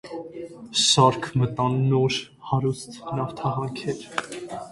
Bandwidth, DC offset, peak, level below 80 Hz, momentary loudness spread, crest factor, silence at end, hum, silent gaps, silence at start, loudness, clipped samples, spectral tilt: 11.5 kHz; under 0.1%; -4 dBFS; -58 dBFS; 17 LU; 20 dB; 0 s; none; none; 0.05 s; -23 LUFS; under 0.1%; -4.5 dB/octave